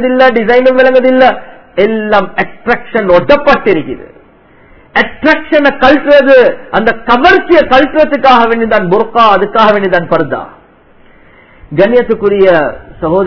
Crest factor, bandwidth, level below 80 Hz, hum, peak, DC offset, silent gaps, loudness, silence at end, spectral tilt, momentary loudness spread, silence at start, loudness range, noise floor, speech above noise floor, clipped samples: 8 dB; 5.4 kHz; -36 dBFS; none; 0 dBFS; 5%; none; -8 LUFS; 0 s; -6.5 dB/octave; 9 LU; 0 s; 4 LU; -41 dBFS; 34 dB; 5%